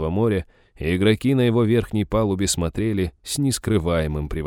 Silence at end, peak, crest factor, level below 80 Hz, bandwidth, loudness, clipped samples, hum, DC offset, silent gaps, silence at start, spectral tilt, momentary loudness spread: 0 s; -6 dBFS; 16 dB; -36 dBFS; 17.5 kHz; -21 LUFS; under 0.1%; none; under 0.1%; none; 0 s; -5.5 dB/octave; 7 LU